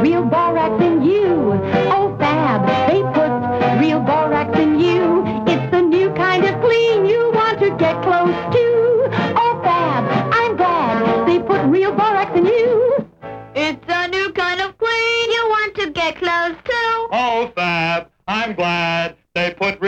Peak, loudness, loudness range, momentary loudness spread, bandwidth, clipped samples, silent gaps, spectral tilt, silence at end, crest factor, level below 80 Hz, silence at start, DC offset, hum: -2 dBFS; -16 LUFS; 3 LU; 5 LU; 8 kHz; under 0.1%; none; -6.5 dB/octave; 0 s; 14 dB; -50 dBFS; 0 s; under 0.1%; none